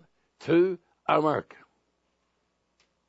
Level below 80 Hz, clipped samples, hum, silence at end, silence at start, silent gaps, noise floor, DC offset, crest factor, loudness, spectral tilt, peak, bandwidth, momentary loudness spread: -76 dBFS; under 0.1%; none; 1.65 s; 0.4 s; none; -75 dBFS; under 0.1%; 22 dB; -26 LUFS; -7.5 dB/octave; -8 dBFS; 7.8 kHz; 11 LU